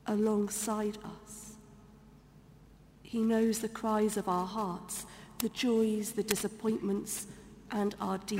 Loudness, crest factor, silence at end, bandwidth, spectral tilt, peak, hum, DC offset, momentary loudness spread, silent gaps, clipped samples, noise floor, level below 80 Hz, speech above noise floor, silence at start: -33 LUFS; 28 dB; 0 s; 16 kHz; -4.5 dB/octave; -6 dBFS; none; under 0.1%; 17 LU; none; under 0.1%; -57 dBFS; -62 dBFS; 25 dB; 0.05 s